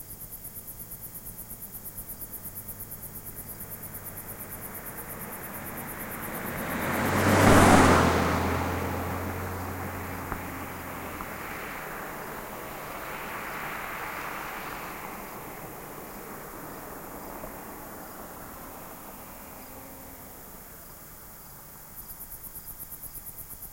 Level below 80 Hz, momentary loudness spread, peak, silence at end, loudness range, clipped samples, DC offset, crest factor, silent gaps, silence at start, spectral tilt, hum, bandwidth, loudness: -48 dBFS; 17 LU; -4 dBFS; 0 s; 19 LU; under 0.1%; under 0.1%; 26 dB; none; 0 s; -5 dB/octave; none; 16.5 kHz; -30 LUFS